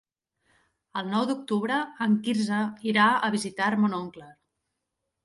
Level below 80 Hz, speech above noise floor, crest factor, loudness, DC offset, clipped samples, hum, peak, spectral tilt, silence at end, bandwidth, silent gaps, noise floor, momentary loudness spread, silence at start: -72 dBFS; 57 dB; 18 dB; -26 LUFS; under 0.1%; under 0.1%; none; -8 dBFS; -5 dB/octave; 0.9 s; 11.5 kHz; none; -82 dBFS; 11 LU; 0.95 s